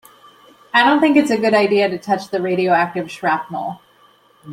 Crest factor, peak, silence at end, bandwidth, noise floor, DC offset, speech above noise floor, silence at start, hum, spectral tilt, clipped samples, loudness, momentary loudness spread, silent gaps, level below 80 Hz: 16 dB; -2 dBFS; 0 s; 15.5 kHz; -52 dBFS; under 0.1%; 36 dB; 0.75 s; none; -5.5 dB/octave; under 0.1%; -17 LUFS; 9 LU; none; -66 dBFS